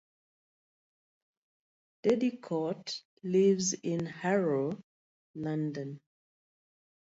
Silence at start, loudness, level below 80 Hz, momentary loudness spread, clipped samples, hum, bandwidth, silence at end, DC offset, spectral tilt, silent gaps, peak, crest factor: 2.05 s; -32 LUFS; -76 dBFS; 14 LU; under 0.1%; none; 8 kHz; 1.15 s; under 0.1%; -5 dB/octave; 3.05-3.17 s, 4.84-5.34 s; -16 dBFS; 18 dB